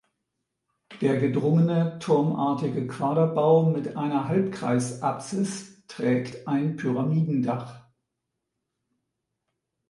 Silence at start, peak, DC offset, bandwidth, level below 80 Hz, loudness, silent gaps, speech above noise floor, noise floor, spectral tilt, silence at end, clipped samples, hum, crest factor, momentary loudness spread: 0.9 s; -8 dBFS; under 0.1%; 11.5 kHz; -68 dBFS; -25 LUFS; none; 58 dB; -82 dBFS; -7.5 dB/octave; 2.1 s; under 0.1%; none; 18 dB; 8 LU